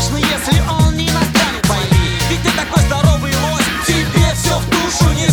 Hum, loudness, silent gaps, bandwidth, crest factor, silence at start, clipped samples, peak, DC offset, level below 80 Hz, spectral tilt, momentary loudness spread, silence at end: none; -14 LUFS; none; over 20 kHz; 14 dB; 0 s; under 0.1%; 0 dBFS; under 0.1%; -22 dBFS; -4.5 dB/octave; 3 LU; 0 s